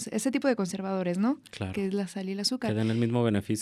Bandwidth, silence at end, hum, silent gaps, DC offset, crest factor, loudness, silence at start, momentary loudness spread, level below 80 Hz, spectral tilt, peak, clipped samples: 14.5 kHz; 0 s; none; none; under 0.1%; 16 dB; -29 LUFS; 0 s; 6 LU; -66 dBFS; -5.5 dB/octave; -12 dBFS; under 0.1%